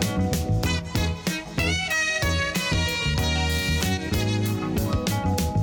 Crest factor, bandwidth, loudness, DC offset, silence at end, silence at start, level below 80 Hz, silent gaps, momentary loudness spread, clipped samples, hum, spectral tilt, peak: 16 dB; 17.5 kHz; -24 LUFS; under 0.1%; 0 s; 0 s; -34 dBFS; none; 3 LU; under 0.1%; none; -4.5 dB/octave; -8 dBFS